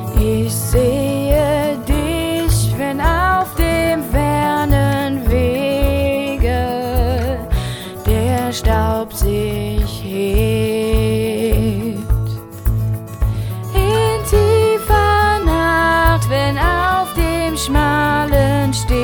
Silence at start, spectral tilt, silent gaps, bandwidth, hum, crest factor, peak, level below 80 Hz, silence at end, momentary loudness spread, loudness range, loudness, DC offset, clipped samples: 0 s; -5.5 dB/octave; none; over 20 kHz; none; 14 dB; 0 dBFS; -22 dBFS; 0 s; 7 LU; 4 LU; -16 LUFS; under 0.1%; under 0.1%